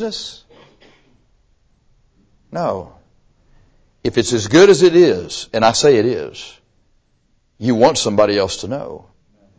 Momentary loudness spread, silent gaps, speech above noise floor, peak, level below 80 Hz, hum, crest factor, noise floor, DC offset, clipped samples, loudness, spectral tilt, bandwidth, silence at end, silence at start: 20 LU; none; 46 dB; 0 dBFS; -48 dBFS; none; 18 dB; -60 dBFS; under 0.1%; under 0.1%; -15 LUFS; -4.5 dB/octave; 8 kHz; 0.6 s; 0 s